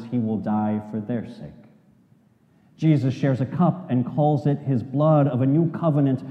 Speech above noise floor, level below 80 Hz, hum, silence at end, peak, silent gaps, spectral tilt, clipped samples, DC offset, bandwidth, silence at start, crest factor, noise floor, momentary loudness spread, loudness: 37 dB; -68 dBFS; none; 0 s; -8 dBFS; none; -10 dB/octave; under 0.1%; under 0.1%; 6.4 kHz; 0 s; 16 dB; -58 dBFS; 9 LU; -22 LUFS